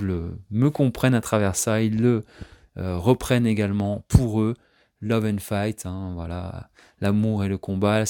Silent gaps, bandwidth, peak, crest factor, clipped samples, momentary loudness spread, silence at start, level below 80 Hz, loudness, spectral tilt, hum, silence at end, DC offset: none; 18 kHz; -2 dBFS; 22 dB; under 0.1%; 12 LU; 0 s; -42 dBFS; -23 LUFS; -6.5 dB/octave; none; 0 s; under 0.1%